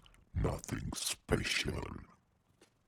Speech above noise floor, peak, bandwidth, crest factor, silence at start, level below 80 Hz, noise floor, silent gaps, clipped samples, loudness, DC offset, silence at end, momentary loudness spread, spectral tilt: 32 dB; -16 dBFS; over 20 kHz; 22 dB; 0.35 s; -48 dBFS; -70 dBFS; none; under 0.1%; -37 LUFS; under 0.1%; 0.8 s; 12 LU; -3.5 dB/octave